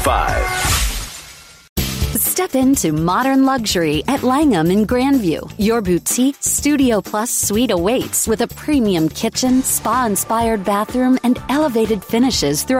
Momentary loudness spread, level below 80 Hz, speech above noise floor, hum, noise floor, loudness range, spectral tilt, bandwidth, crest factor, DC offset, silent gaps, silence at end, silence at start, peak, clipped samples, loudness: 4 LU; -32 dBFS; 23 dB; none; -39 dBFS; 2 LU; -4 dB/octave; 16.5 kHz; 14 dB; under 0.1%; 1.69-1.76 s; 0 s; 0 s; -4 dBFS; under 0.1%; -16 LUFS